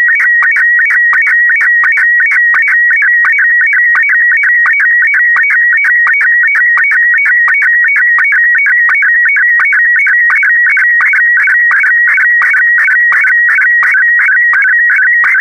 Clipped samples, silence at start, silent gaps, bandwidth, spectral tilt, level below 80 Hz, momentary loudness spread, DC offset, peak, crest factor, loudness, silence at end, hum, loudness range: under 0.1%; 0 s; none; 10.5 kHz; 0.5 dB/octave; -66 dBFS; 0 LU; under 0.1%; 0 dBFS; 6 dB; -5 LUFS; 0 s; none; 0 LU